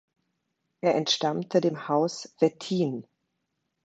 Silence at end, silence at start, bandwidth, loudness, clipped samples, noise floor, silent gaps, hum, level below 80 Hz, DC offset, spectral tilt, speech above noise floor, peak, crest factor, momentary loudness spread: 0.85 s; 0.85 s; 8.8 kHz; -27 LUFS; under 0.1%; -79 dBFS; none; none; -76 dBFS; under 0.1%; -5 dB/octave; 53 dB; -8 dBFS; 20 dB; 6 LU